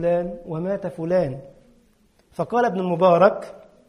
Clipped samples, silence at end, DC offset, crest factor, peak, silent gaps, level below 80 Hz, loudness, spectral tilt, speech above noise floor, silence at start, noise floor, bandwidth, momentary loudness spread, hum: under 0.1%; 0.3 s; under 0.1%; 18 dB; -4 dBFS; none; -54 dBFS; -21 LUFS; -8 dB/octave; 39 dB; 0 s; -60 dBFS; 10.5 kHz; 18 LU; none